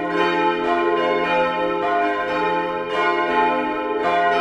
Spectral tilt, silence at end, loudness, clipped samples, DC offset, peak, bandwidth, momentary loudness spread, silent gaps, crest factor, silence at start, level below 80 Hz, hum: -5.5 dB/octave; 0 s; -20 LUFS; under 0.1%; under 0.1%; -6 dBFS; 10.5 kHz; 3 LU; none; 14 dB; 0 s; -54 dBFS; none